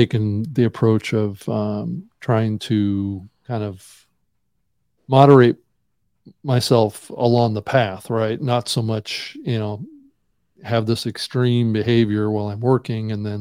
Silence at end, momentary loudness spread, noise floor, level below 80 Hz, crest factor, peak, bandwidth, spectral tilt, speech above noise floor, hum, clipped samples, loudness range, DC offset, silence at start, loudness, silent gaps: 0 s; 11 LU; -73 dBFS; -58 dBFS; 20 dB; 0 dBFS; 16 kHz; -7 dB/octave; 55 dB; none; under 0.1%; 7 LU; under 0.1%; 0 s; -20 LUFS; none